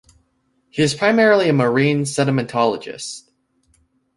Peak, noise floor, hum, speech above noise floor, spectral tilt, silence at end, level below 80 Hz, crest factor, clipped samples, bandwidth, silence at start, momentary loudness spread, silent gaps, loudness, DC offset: -2 dBFS; -65 dBFS; none; 48 dB; -5.5 dB/octave; 1 s; -58 dBFS; 18 dB; under 0.1%; 11.5 kHz; 0.75 s; 16 LU; none; -17 LUFS; under 0.1%